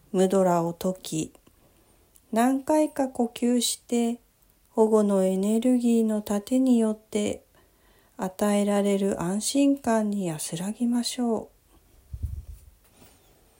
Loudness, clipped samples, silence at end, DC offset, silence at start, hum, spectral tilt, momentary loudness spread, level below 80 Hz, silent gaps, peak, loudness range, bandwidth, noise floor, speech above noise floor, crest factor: -25 LUFS; under 0.1%; 1.05 s; under 0.1%; 0.15 s; none; -5.5 dB/octave; 12 LU; -52 dBFS; none; -8 dBFS; 4 LU; 16.5 kHz; -62 dBFS; 38 dB; 16 dB